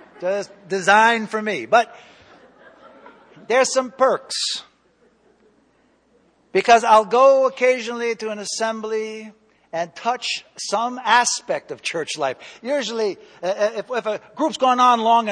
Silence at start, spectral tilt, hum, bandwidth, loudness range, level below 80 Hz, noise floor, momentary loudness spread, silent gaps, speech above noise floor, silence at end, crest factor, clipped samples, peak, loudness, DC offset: 0.2 s; -2 dB/octave; none; 10 kHz; 6 LU; -68 dBFS; -60 dBFS; 13 LU; none; 41 dB; 0 s; 20 dB; under 0.1%; -2 dBFS; -19 LUFS; under 0.1%